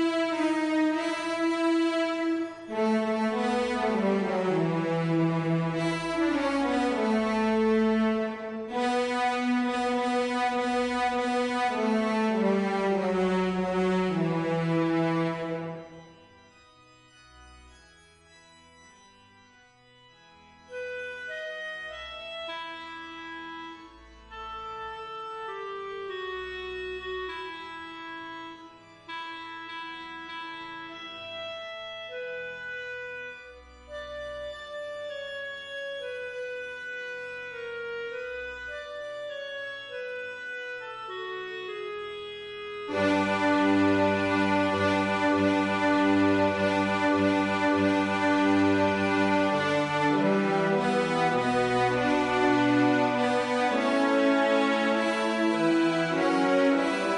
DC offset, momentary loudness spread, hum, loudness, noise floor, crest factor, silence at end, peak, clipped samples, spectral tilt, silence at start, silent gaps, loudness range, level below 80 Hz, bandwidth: under 0.1%; 14 LU; none; -27 LUFS; -58 dBFS; 16 dB; 0 s; -12 dBFS; under 0.1%; -6 dB/octave; 0 s; none; 14 LU; -60 dBFS; 11 kHz